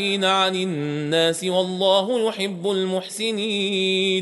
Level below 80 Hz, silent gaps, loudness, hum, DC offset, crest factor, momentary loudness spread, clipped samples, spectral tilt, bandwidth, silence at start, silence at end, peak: -72 dBFS; none; -21 LUFS; none; under 0.1%; 16 dB; 7 LU; under 0.1%; -4 dB/octave; 11.5 kHz; 0 s; 0 s; -6 dBFS